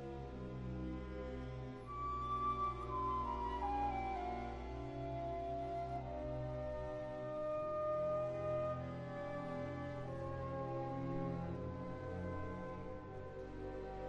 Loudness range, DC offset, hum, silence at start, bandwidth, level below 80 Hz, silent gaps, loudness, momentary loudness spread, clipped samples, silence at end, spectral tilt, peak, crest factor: 3 LU; under 0.1%; none; 0 s; 8.6 kHz; -54 dBFS; none; -43 LUFS; 8 LU; under 0.1%; 0 s; -8.5 dB/octave; -28 dBFS; 14 dB